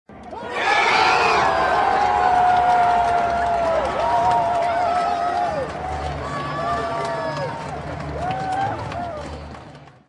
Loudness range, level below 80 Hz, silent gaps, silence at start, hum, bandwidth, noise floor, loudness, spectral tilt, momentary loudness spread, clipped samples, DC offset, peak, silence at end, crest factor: 9 LU; -44 dBFS; none; 0.1 s; none; 11 kHz; -42 dBFS; -20 LUFS; -4.5 dB/octave; 14 LU; under 0.1%; under 0.1%; -4 dBFS; 0.2 s; 16 dB